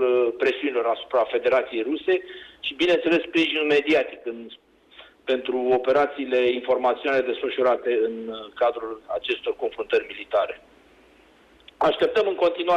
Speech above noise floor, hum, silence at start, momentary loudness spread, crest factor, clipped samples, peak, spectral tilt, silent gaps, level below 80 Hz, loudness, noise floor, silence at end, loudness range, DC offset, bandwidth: 32 dB; none; 0 s; 11 LU; 12 dB; under 0.1%; -12 dBFS; -5 dB/octave; none; -62 dBFS; -23 LUFS; -55 dBFS; 0 s; 4 LU; under 0.1%; 8.6 kHz